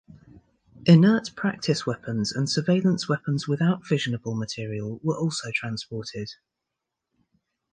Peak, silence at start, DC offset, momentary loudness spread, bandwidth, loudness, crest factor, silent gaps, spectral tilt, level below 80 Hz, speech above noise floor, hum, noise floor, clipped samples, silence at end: -4 dBFS; 0.8 s; under 0.1%; 14 LU; 9.6 kHz; -25 LUFS; 22 dB; none; -6 dB/octave; -62 dBFS; 60 dB; none; -84 dBFS; under 0.1%; 1.4 s